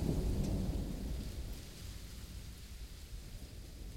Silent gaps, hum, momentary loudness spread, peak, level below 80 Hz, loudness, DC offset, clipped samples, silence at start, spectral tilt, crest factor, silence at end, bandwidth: none; none; 13 LU; -20 dBFS; -44 dBFS; -43 LUFS; under 0.1%; under 0.1%; 0 s; -6 dB/octave; 20 dB; 0 s; 17 kHz